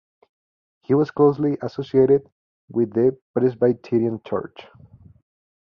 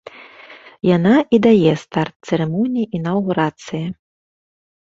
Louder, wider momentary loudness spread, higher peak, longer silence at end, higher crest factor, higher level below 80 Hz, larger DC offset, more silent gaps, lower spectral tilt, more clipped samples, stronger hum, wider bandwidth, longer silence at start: second, -21 LUFS vs -17 LUFS; about the same, 11 LU vs 12 LU; about the same, -4 dBFS vs -2 dBFS; first, 1.15 s vs 0.95 s; about the same, 18 dB vs 16 dB; about the same, -60 dBFS vs -56 dBFS; neither; first, 2.32-2.68 s, 3.22-3.34 s vs 2.16-2.20 s; first, -10 dB/octave vs -7.5 dB/octave; neither; neither; second, 6 kHz vs 7.8 kHz; first, 0.9 s vs 0.2 s